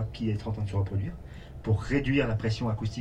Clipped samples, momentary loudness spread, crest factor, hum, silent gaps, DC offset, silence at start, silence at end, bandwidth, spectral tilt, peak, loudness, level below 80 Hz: under 0.1%; 12 LU; 16 dB; none; none; 0.1%; 0 s; 0 s; 8.8 kHz; -7.5 dB/octave; -12 dBFS; -30 LUFS; -44 dBFS